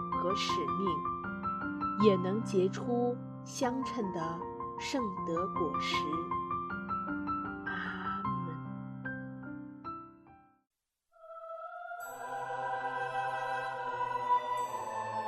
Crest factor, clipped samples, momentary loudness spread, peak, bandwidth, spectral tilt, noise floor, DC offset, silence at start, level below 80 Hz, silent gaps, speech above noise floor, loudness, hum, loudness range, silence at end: 22 dB; under 0.1%; 12 LU; -14 dBFS; 13.5 kHz; -5.5 dB/octave; -69 dBFS; under 0.1%; 0 s; -64 dBFS; none; 37 dB; -35 LUFS; none; 12 LU; 0 s